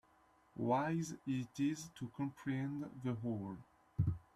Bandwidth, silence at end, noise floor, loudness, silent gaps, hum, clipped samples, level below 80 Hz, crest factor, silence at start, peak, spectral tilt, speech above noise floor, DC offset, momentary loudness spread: 13 kHz; 0.15 s; -71 dBFS; -41 LUFS; none; none; under 0.1%; -66 dBFS; 18 dB; 0.55 s; -22 dBFS; -7 dB/octave; 31 dB; under 0.1%; 12 LU